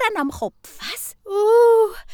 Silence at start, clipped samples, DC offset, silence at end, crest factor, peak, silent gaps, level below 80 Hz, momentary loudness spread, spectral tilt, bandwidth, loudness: 0 s; under 0.1%; under 0.1%; 0 s; 12 dB; -6 dBFS; none; -50 dBFS; 17 LU; -3 dB/octave; 19.5 kHz; -18 LUFS